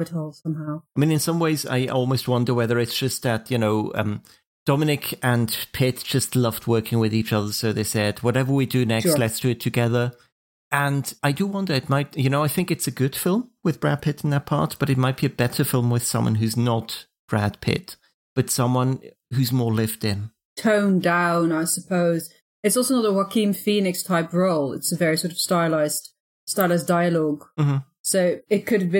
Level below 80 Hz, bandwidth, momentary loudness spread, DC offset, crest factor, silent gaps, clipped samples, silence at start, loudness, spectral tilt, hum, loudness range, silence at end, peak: -58 dBFS; 17 kHz; 7 LU; under 0.1%; 18 dB; 4.46-4.66 s, 10.32-10.71 s, 17.19-17.28 s, 18.14-18.36 s, 20.45-20.56 s, 22.42-22.63 s, 26.20-26.47 s, 27.99-28.04 s; under 0.1%; 0 s; -22 LUFS; -5 dB/octave; none; 2 LU; 0 s; -4 dBFS